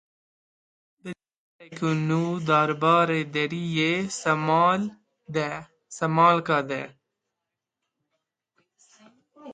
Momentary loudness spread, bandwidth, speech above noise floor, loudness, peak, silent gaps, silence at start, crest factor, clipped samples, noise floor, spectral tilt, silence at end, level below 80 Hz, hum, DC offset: 21 LU; 9.4 kHz; 62 dB; -24 LUFS; -6 dBFS; 1.36-1.59 s; 1.05 s; 20 dB; under 0.1%; -85 dBFS; -5.5 dB/octave; 0 s; -70 dBFS; none; under 0.1%